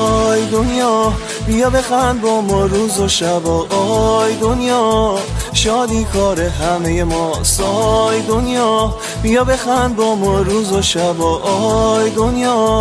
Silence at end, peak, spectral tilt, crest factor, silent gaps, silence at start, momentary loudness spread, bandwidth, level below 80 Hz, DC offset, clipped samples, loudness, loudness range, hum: 0 s; 0 dBFS; -4.5 dB/octave; 14 dB; none; 0 s; 3 LU; 11 kHz; -26 dBFS; under 0.1%; under 0.1%; -14 LUFS; 1 LU; none